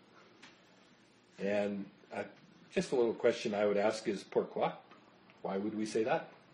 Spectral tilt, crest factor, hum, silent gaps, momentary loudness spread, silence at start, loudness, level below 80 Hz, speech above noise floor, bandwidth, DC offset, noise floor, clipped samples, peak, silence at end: -5.5 dB/octave; 20 dB; none; none; 13 LU; 0.45 s; -35 LUFS; -78 dBFS; 30 dB; 11 kHz; under 0.1%; -64 dBFS; under 0.1%; -18 dBFS; 0.2 s